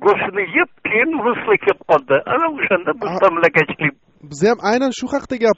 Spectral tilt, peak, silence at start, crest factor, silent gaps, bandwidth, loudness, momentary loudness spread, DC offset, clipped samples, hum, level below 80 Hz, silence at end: -3.5 dB/octave; -2 dBFS; 0 s; 16 dB; none; 8 kHz; -17 LUFS; 6 LU; under 0.1%; under 0.1%; none; -54 dBFS; 0.05 s